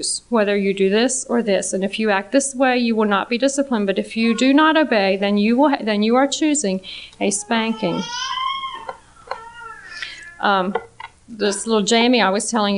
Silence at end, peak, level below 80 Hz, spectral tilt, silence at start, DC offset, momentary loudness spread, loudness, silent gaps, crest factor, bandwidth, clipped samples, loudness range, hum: 0 s; -2 dBFS; -56 dBFS; -3.5 dB/octave; 0 s; under 0.1%; 17 LU; -18 LUFS; none; 16 dB; 10.5 kHz; under 0.1%; 8 LU; none